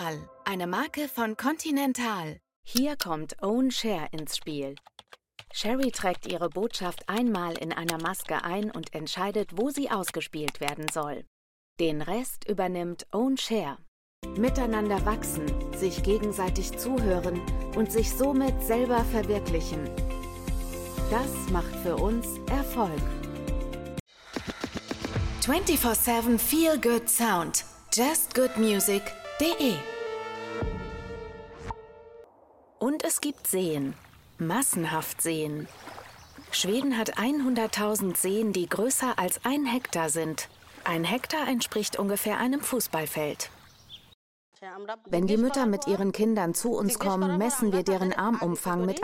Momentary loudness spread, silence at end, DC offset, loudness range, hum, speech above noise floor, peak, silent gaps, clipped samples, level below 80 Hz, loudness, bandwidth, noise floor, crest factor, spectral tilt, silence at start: 12 LU; 0 s; under 0.1%; 7 LU; none; 30 dB; -6 dBFS; 2.56-2.63 s, 11.27-11.76 s, 13.88-14.22 s, 24.00-24.06 s, 44.14-44.52 s; under 0.1%; -40 dBFS; -28 LUFS; 16.5 kHz; -58 dBFS; 22 dB; -4 dB/octave; 0 s